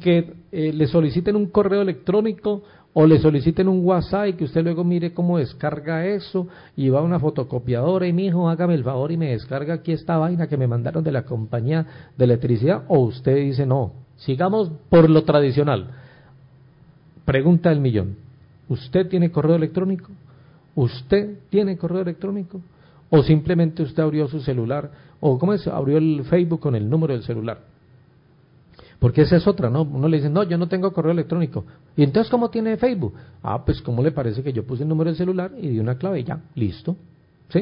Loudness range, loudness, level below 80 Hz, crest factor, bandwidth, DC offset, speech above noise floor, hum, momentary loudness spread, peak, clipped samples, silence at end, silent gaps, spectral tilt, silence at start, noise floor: 4 LU; -21 LUFS; -46 dBFS; 16 dB; 5.4 kHz; under 0.1%; 34 dB; none; 10 LU; -4 dBFS; under 0.1%; 0 s; none; -13 dB/octave; 0 s; -54 dBFS